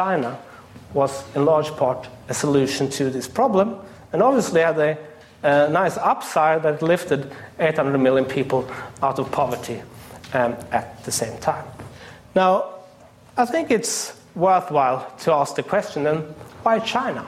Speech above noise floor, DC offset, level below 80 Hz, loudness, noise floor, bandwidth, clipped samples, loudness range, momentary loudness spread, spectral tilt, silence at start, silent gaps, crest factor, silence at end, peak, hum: 27 dB; under 0.1%; -58 dBFS; -21 LUFS; -48 dBFS; 16 kHz; under 0.1%; 4 LU; 13 LU; -5 dB/octave; 0 s; none; 16 dB; 0 s; -6 dBFS; none